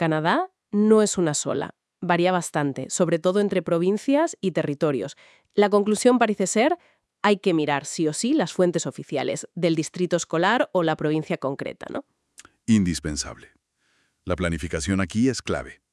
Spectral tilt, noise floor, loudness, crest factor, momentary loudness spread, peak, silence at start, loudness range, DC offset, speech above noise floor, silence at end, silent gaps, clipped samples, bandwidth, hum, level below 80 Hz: -5 dB/octave; -68 dBFS; -23 LUFS; 18 dB; 11 LU; -6 dBFS; 0 s; 5 LU; under 0.1%; 46 dB; 0.2 s; none; under 0.1%; 12 kHz; none; -52 dBFS